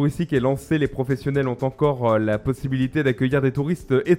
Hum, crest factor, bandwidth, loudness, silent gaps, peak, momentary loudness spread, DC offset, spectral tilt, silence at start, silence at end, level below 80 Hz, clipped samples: none; 16 dB; 15.5 kHz; -22 LUFS; none; -4 dBFS; 4 LU; under 0.1%; -8 dB/octave; 0 s; 0 s; -46 dBFS; under 0.1%